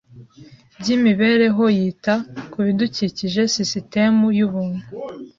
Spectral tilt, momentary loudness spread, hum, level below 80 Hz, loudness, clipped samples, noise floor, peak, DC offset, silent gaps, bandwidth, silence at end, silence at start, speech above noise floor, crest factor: -5 dB/octave; 12 LU; none; -58 dBFS; -19 LUFS; under 0.1%; -46 dBFS; -4 dBFS; under 0.1%; none; 7.4 kHz; 0.1 s; 0.15 s; 28 dB; 16 dB